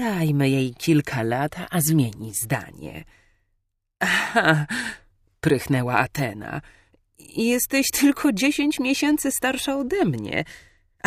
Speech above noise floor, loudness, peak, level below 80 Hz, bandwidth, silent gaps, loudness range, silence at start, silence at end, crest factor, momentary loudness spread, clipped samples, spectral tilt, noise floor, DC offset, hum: 51 dB; -22 LUFS; -4 dBFS; -52 dBFS; 15.5 kHz; none; 4 LU; 0 s; 0.5 s; 20 dB; 14 LU; under 0.1%; -4.5 dB/octave; -73 dBFS; under 0.1%; none